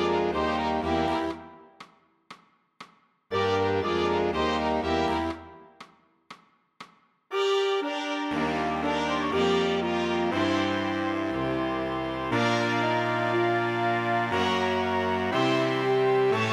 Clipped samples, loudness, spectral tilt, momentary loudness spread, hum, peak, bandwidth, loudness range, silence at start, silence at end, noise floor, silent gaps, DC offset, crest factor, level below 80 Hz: under 0.1%; -26 LUFS; -5.5 dB/octave; 5 LU; none; -10 dBFS; 12.5 kHz; 5 LU; 0 s; 0 s; -54 dBFS; none; under 0.1%; 16 dB; -52 dBFS